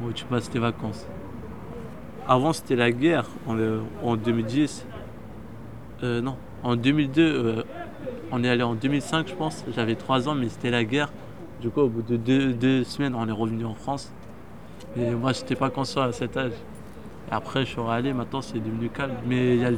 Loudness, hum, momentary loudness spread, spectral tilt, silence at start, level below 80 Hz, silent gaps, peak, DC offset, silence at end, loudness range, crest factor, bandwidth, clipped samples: -26 LUFS; none; 18 LU; -6.5 dB/octave; 0 s; -52 dBFS; none; -6 dBFS; 0.6%; 0 s; 4 LU; 20 dB; 14 kHz; under 0.1%